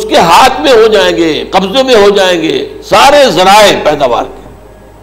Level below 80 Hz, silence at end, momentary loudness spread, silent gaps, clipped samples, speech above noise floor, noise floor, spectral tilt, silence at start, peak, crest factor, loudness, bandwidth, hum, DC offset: -34 dBFS; 0.5 s; 8 LU; none; 1%; 27 dB; -33 dBFS; -3.5 dB/octave; 0 s; 0 dBFS; 6 dB; -6 LUFS; 16.5 kHz; none; under 0.1%